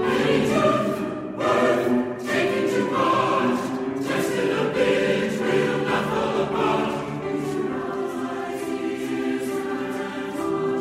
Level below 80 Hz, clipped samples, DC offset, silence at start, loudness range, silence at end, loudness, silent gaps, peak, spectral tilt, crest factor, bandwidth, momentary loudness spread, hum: -56 dBFS; under 0.1%; under 0.1%; 0 s; 5 LU; 0 s; -23 LUFS; none; -6 dBFS; -5.5 dB/octave; 16 dB; 15.5 kHz; 8 LU; none